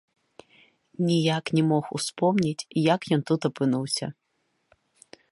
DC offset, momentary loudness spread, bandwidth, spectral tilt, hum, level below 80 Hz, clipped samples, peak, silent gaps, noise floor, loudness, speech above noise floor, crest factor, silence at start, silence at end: under 0.1%; 6 LU; 11.5 kHz; -5.5 dB/octave; none; -68 dBFS; under 0.1%; -8 dBFS; none; -74 dBFS; -25 LUFS; 49 dB; 20 dB; 1 s; 1.2 s